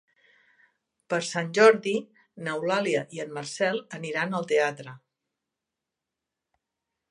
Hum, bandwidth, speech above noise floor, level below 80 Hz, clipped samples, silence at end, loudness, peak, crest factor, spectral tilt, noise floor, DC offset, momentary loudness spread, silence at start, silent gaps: none; 11 kHz; 61 dB; -82 dBFS; under 0.1%; 2.15 s; -26 LUFS; -4 dBFS; 24 dB; -4.5 dB/octave; -87 dBFS; under 0.1%; 16 LU; 1.1 s; none